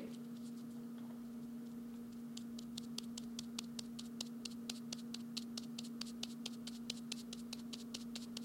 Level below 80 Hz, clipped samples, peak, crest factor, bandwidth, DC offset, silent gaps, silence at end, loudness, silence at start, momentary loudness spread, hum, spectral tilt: -76 dBFS; under 0.1%; -22 dBFS; 26 dB; 16.5 kHz; under 0.1%; none; 0 s; -47 LUFS; 0 s; 4 LU; none; -3 dB/octave